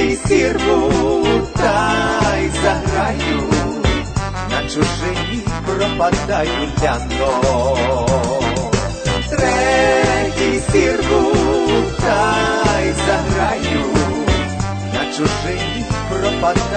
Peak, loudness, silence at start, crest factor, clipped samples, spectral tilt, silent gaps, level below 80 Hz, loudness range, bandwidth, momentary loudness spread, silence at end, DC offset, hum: -2 dBFS; -16 LUFS; 0 s; 14 dB; under 0.1%; -5 dB/octave; none; -28 dBFS; 3 LU; 9.2 kHz; 6 LU; 0 s; under 0.1%; none